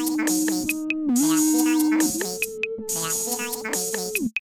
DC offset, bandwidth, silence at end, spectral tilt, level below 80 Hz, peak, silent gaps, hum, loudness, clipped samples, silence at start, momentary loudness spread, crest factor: under 0.1%; 18 kHz; 0 s; -2.5 dB/octave; -60 dBFS; -8 dBFS; none; none; -23 LUFS; under 0.1%; 0 s; 7 LU; 14 dB